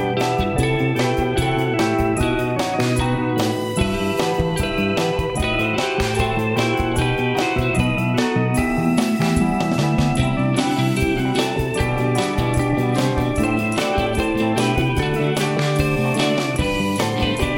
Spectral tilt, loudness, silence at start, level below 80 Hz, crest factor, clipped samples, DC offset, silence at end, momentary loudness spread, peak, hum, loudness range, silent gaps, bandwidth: -5.5 dB/octave; -20 LUFS; 0 s; -32 dBFS; 14 dB; under 0.1%; under 0.1%; 0 s; 2 LU; -4 dBFS; none; 1 LU; none; 17 kHz